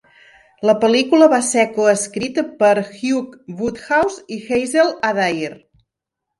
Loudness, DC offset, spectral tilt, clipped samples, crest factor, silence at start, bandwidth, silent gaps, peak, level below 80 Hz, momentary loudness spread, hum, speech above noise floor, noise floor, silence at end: -17 LUFS; under 0.1%; -3.5 dB/octave; under 0.1%; 16 dB; 0.6 s; 11.5 kHz; none; 0 dBFS; -56 dBFS; 12 LU; none; 64 dB; -81 dBFS; 0.85 s